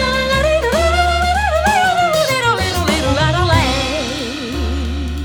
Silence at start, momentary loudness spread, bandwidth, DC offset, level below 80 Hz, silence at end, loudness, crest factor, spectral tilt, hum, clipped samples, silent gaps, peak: 0 s; 8 LU; over 20 kHz; under 0.1%; -24 dBFS; 0 s; -15 LUFS; 14 dB; -4.5 dB/octave; none; under 0.1%; none; -2 dBFS